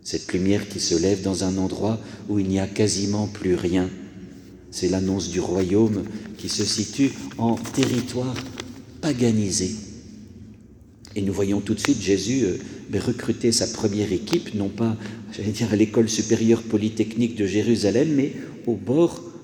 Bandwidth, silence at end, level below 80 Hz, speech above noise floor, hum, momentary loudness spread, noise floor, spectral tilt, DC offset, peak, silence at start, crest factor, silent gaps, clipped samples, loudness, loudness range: 19.5 kHz; 0 s; -52 dBFS; 25 dB; none; 12 LU; -47 dBFS; -5 dB/octave; under 0.1%; 0 dBFS; 0.05 s; 22 dB; none; under 0.1%; -23 LUFS; 4 LU